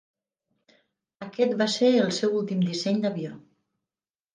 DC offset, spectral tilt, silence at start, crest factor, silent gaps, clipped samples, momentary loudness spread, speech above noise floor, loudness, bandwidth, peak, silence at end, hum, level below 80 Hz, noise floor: under 0.1%; -5.5 dB/octave; 1.2 s; 18 dB; none; under 0.1%; 16 LU; over 66 dB; -25 LUFS; 9.8 kHz; -10 dBFS; 0.95 s; none; -76 dBFS; under -90 dBFS